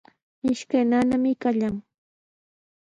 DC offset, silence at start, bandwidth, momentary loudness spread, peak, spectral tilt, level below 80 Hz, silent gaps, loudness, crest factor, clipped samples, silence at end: under 0.1%; 0.45 s; 9.4 kHz; 9 LU; -10 dBFS; -6 dB/octave; -58 dBFS; none; -24 LUFS; 14 dB; under 0.1%; 1.05 s